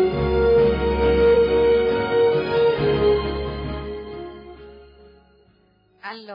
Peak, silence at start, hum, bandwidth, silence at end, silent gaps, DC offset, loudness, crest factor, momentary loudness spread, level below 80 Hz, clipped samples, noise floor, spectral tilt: -8 dBFS; 0 s; none; 5.4 kHz; 0 s; none; under 0.1%; -19 LUFS; 12 dB; 19 LU; -34 dBFS; under 0.1%; -59 dBFS; -9.5 dB/octave